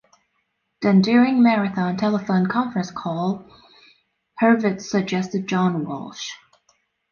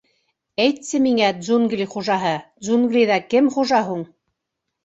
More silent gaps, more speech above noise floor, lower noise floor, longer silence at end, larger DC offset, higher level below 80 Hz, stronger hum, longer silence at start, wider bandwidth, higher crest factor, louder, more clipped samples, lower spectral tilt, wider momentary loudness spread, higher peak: neither; second, 52 dB vs 61 dB; second, -72 dBFS vs -79 dBFS; about the same, 0.75 s vs 0.8 s; neither; about the same, -64 dBFS vs -64 dBFS; neither; first, 0.8 s vs 0.6 s; second, 7 kHz vs 8 kHz; about the same, 16 dB vs 18 dB; about the same, -21 LUFS vs -19 LUFS; neither; first, -6.5 dB/octave vs -4.5 dB/octave; first, 14 LU vs 10 LU; about the same, -4 dBFS vs -2 dBFS